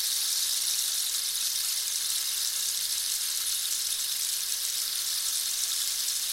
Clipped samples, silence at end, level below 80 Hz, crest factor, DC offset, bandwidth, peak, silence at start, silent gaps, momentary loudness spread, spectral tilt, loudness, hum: under 0.1%; 0 s; -68 dBFS; 20 dB; under 0.1%; 17 kHz; -10 dBFS; 0 s; none; 2 LU; 4.5 dB/octave; -26 LUFS; none